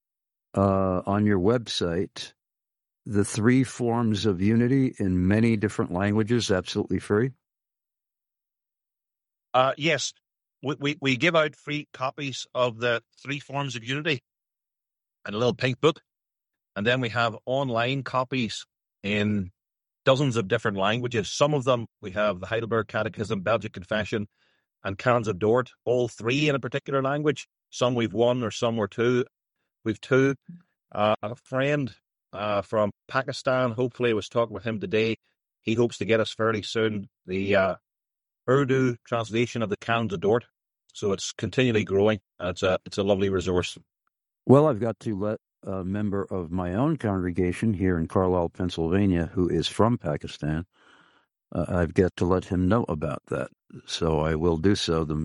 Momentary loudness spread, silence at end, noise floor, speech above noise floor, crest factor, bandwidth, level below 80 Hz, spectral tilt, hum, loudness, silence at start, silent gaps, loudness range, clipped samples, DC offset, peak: 10 LU; 0 s; -89 dBFS; 64 dB; 24 dB; 11.5 kHz; -52 dBFS; -6 dB/octave; none; -26 LUFS; 0.55 s; none; 4 LU; under 0.1%; under 0.1%; -2 dBFS